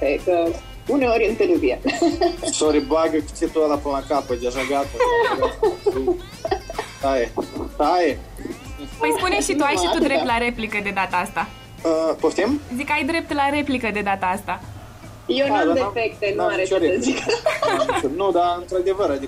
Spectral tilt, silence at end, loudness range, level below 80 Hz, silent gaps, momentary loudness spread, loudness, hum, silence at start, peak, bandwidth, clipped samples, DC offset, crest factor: -4 dB/octave; 0 s; 2 LU; -42 dBFS; none; 9 LU; -21 LUFS; none; 0 s; -8 dBFS; 16 kHz; under 0.1%; under 0.1%; 14 dB